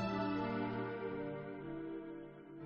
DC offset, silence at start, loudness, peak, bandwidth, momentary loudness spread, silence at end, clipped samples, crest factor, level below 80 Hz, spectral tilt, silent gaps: under 0.1%; 0 s; -42 LUFS; -28 dBFS; 6.6 kHz; 11 LU; 0 s; under 0.1%; 14 dB; -66 dBFS; -5.5 dB/octave; none